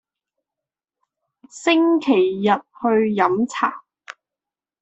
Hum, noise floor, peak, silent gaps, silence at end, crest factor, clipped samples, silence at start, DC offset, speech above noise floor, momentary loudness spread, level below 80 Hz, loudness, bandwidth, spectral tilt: none; -89 dBFS; -4 dBFS; none; 0.7 s; 18 dB; under 0.1%; 1.55 s; under 0.1%; 70 dB; 7 LU; -68 dBFS; -19 LUFS; 8.2 kHz; -5.5 dB/octave